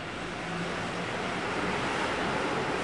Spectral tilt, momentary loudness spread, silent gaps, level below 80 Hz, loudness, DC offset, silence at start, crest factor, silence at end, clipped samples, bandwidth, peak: -4.5 dB/octave; 5 LU; none; -54 dBFS; -31 LUFS; 0.1%; 0 s; 14 dB; 0 s; under 0.1%; 11.5 kHz; -16 dBFS